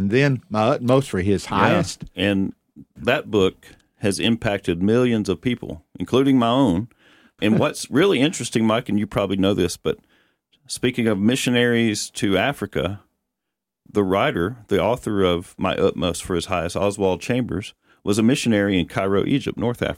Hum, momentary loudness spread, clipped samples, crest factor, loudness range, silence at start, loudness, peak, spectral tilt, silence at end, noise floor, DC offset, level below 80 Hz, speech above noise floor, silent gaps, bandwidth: none; 8 LU; under 0.1%; 18 dB; 2 LU; 0 s; -21 LUFS; -2 dBFS; -5.5 dB/octave; 0 s; -83 dBFS; under 0.1%; -48 dBFS; 63 dB; none; 16 kHz